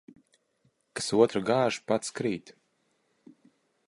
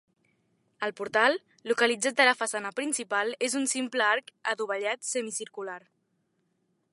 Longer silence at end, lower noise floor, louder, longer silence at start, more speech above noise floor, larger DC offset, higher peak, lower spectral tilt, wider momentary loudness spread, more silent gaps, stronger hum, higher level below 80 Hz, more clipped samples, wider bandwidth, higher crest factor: first, 1.35 s vs 1.15 s; about the same, -73 dBFS vs -75 dBFS; about the same, -28 LUFS vs -27 LUFS; first, 0.95 s vs 0.8 s; about the same, 46 dB vs 46 dB; neither; about the same, -8 dBFS vs -6 dBFS; first, -4.5 dB/octave vs -1 dB/octave; about the same, 12 LU vs 12 LU; neither; neither; first, -70 dBFS vs -86 dBFS; neither; about the same, 11.5 kHz vs 11.5 kHz; about the same, 22 dB vs 24 dB